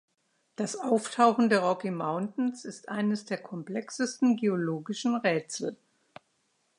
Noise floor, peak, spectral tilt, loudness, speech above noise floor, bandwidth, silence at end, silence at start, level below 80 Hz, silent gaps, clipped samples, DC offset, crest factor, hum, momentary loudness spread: -74 dBFS; -8 dBFS; -5 dB/octave; -29 LUFS; 45 dB; 11 kHz; 1.05 s; 0.6 s; -82 dBFS; none; under 0.1%; under 0.1%; 22 dB; none; 12 LU